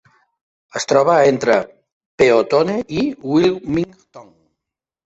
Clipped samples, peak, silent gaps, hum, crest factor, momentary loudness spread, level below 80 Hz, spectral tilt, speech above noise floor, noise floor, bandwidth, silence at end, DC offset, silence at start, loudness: under 0.1%; -2 dBFS; 1.93-2.18 s; none; 16 dB; 12 LU; -52 dBFS; -5.5 dB/octave; 68 dB; -84 dBFS; 8.2 kHz; 0.85 s; under 0.1%; 0.75 s; -16 LUFS